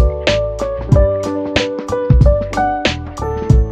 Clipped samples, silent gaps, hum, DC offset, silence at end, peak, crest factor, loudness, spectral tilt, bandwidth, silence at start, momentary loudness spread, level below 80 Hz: under 0.1%; none; none; under 0.1%; 0 s; 0 dBFS; 14 dB; -16 LUFS; -6.5 dB/octave; 8.8 kHz; 0 s; 9 LU; -18 dBFS